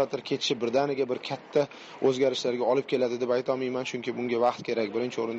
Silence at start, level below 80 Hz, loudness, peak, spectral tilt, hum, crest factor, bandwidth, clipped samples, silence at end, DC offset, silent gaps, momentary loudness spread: 0 s; -74 dBFS; -28 LUFS; -12 dBFS; -5 dB/octave; none; 16 dB; 8.2 kHz; under 0.1%; 0 s; under 0.1%; none; 5 LU